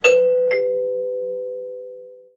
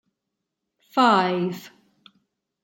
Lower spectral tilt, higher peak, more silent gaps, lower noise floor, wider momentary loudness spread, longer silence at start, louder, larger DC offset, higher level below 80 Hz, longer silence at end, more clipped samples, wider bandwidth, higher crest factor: second, -2 dB/octave vs -5.5 dB/octave; about the same, -2 dBFS vs -4 dBFS; neither; second, -39 dBFS vs -82 dBFS; first, 20 LU vs 13 LU; second, 0.05 s vs 0.95 s; about the same, -20 LUFS vs -21 LUFS; neither; first, -68 dBFS vs -76 dBFS; second, 0.2 s vs 0.95 s; neither; second, 7.2 kHz vs 17 kHz; about the same, 18 dB vs 22 dB